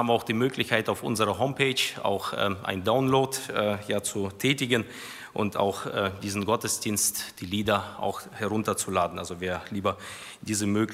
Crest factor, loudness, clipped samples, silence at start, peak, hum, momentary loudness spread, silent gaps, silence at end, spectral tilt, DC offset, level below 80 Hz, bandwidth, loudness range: 20 dB; -27 LUFS; under 0.1%; 0 s; -8 dBFS; none; 8 LU; none; 0 s; -4 dB/octave; under 0.1%; -62 dBFS; 16 kHz; 3 LU